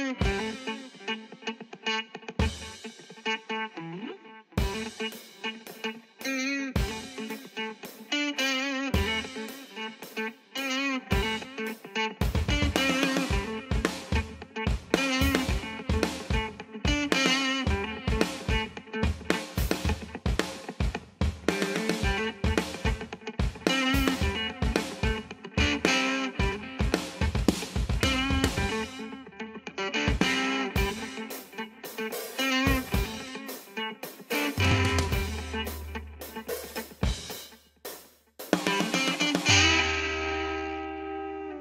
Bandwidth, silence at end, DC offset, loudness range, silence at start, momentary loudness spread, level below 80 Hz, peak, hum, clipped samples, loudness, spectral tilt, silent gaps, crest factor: 16 kHz; 0 s; under 0.1%; 7 LU; 0 s; 13 LU; -38 dBFS; -4 dBFS; none; under 0.1%; -29 LUFS; -4 dB/octave; none; 26 dB